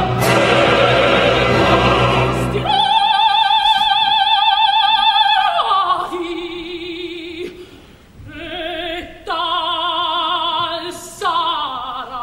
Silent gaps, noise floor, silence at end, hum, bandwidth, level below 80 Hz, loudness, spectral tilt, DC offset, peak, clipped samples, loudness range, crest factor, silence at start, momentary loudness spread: none; -42 dBFS; 0 s; none; 16 kHz; -38 dBFS; -15 LUFS; -4.5 dB/octave; under 0.1%; -2 dBFS; under 0.1%; 11 LU; 14 dB; 0 s; 14 LU